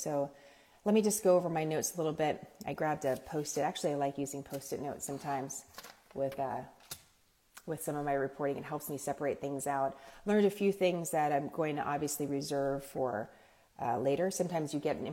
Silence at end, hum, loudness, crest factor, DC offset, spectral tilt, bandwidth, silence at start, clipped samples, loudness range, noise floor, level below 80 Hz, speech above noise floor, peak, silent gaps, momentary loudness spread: 0 s; none; -34 LUFS; 18 dB; under 0.1%; -5 dB/octave; 16.5 kHz; 0 s; under 0.1%; 7 LU; -69 dBFS; -68 dBFS; 35 dB; -16 dBFS; none; 13 LU